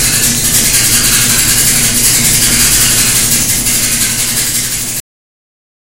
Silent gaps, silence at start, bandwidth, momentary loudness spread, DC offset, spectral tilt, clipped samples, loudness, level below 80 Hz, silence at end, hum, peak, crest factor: none; 0 s; over 20 kHz; 5 LU; under 0.1%; -1 dB/octave; 0.3%; -7 LUFS; -28 dBFS; 0.95 s; none; 0 dBFS; 10 dB